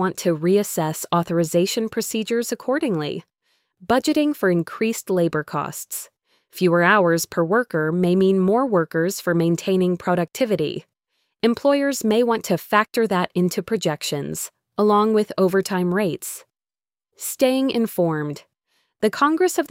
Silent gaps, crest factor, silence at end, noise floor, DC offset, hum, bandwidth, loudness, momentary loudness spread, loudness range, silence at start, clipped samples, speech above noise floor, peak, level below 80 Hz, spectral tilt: none; 18 dB; 0.05 s; under -90 dBFS; under 0.1%; none; 16.5 kHz; -21 LUFS; 11 LU; 4 LU; 0 s; under 0.1%; over 70 dB; -4 dBFS; -62 dBFS; -5 dB/octave